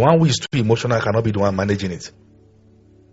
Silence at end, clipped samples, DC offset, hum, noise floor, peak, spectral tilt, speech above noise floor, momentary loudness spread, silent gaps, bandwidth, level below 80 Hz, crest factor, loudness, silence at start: 1.05 s; under 0.1%; under 0.1%; none; -51 dBFS; 0 dBFS; -5.5 dB/octave; 33 dB; 12 LU; none; 8 kHz; -50 dBFS; 20 dB; -19 LUFS; 0 s